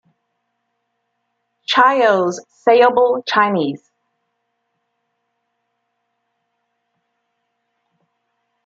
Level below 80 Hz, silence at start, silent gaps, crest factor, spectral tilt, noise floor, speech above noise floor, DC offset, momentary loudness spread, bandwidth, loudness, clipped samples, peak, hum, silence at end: -70 dBFS; 1.7 s; none; 18 dB; -4.5 dB/octave; -72 dBFS; 58 dB; under 0.1%; 12 LU; 7.8 kHz; -15 LUFS; under 0.1%; -2 dBFS; none; 4.9 s